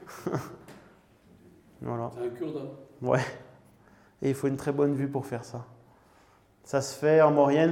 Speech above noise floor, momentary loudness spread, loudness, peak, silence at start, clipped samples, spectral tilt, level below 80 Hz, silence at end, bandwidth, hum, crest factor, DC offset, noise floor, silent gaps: 34 dB; 21 LU; -28 LUFS; -8 dBFS; 0 s; under 0.1%; -6.5 dB/octave; -68 dBFS; 0 s; 16.5 kHz; none; 22 dB; under 0.1%; -61 dBFS; none